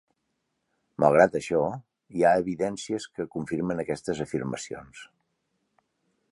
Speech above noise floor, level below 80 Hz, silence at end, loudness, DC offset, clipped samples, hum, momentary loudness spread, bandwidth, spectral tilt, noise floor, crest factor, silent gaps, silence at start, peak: 52 dB; -60 dBFS; 1.3 s; -26 LUFS; under 0.1%; under 0.1%; none; 17 LU; 11.5 kHz; -6 dB/octave; -78 dBFS; 24 dB; none; 1 s; -4 dBFS